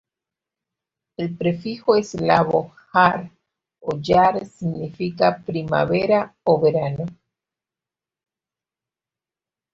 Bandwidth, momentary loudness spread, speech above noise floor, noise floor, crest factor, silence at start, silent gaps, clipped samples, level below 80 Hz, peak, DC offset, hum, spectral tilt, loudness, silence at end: 7.8 kHz; 13 LU; 70 dB; -90 dBFS; 20 dB; 1.2 s; none; under 0.1%; -56 dBFS; -2 dBFS; under 0.1%; none; -7 dB/octave; -20 LUFS; 2.6 s